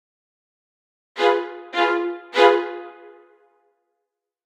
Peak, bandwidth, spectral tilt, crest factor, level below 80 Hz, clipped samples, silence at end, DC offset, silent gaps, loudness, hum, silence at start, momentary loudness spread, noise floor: -2 dBFS; 10 kHz; -2 dB/octave; 22 dB; -78 dBFS; under 0.1%; 1.55 s; under 0.1%; none; -20 LUFS; none; 1.15 s; 20 LU; -81 dBFS